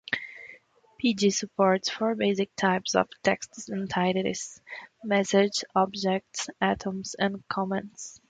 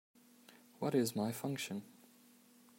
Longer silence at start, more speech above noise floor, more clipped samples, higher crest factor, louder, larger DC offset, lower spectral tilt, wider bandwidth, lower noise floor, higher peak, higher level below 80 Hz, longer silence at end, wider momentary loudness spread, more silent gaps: second, 0.1 s vs 0.5 s; about the same, 27 dB vs 28 dB; neither; about the same, 20 dB vs 20 dB; first, -27 LUFS vs -39 LUFS; neither; about the same, -4 dB/octave vs -5 dB/octave; second, 9.4 kHz vs 16 kHz; second, -54 dBFS vs -65 dBFS; first, -8 dBFS vs -22 dBFS; first, -64 dBFS vs -84 dBFS; second, 0.1 s vs 0.85 s; about the same, 13 LU vs 12 LU; neither